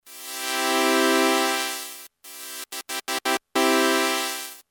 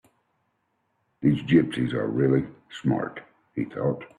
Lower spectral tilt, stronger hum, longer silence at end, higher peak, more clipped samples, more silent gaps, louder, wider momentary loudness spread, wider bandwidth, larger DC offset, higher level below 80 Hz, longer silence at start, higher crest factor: second, 0.5 dB/octave vs -8.5 dB/octave; neither; about the same, 0.1 s vs 0.1 s; first, -4 dBFS vs -8 dBFS; neither; neither; about the same, -23 LUFS vs -25 LUFS; about the same, 16 LU vs 14 LU; first, over 20 kHz vs 10.5 kHz; neither; second, -80 dBFS vs -58 dBFS; second, 0.05 s vs 1.2 s; about the same, 20 dB vs 18 dB